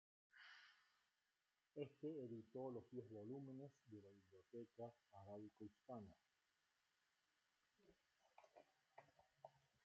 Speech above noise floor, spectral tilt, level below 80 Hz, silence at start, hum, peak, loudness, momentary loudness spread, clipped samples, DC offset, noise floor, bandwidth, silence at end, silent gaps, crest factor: over 33 dB; -6.5 dB/octave; under -90 dBFS; 0.35 s; none; -38 dBFS; -58 LUFS; 13 LU; under 0.1%; under 0.1%; under -90 dBFS; 7.2 kHz; 0.25 s; none; 22 dB